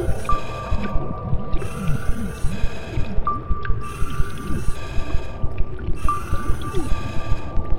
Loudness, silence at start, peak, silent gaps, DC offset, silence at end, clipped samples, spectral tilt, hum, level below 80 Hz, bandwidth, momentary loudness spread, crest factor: -27 LUFS; 0 s; -4 dBFS; none; under 0.1%; 0 s; under 0.1%; -6.5 dB/octave; none; -26 dBFS; 11 kHz; 4 LU; 14 dB